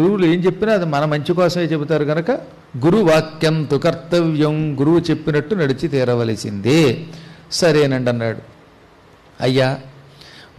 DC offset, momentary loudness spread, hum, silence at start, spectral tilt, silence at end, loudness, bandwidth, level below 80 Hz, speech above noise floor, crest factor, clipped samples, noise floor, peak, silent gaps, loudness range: under 0.1%; 8 LU; none; 0 s; -6.5 dB/octave; 0.15 s; -17 LUFS; 13.5 kHz; -50 dBFS; 31 dB; 12 dB; under 0.1%; -47 dBFS; -6 dBFS; none; 2 LU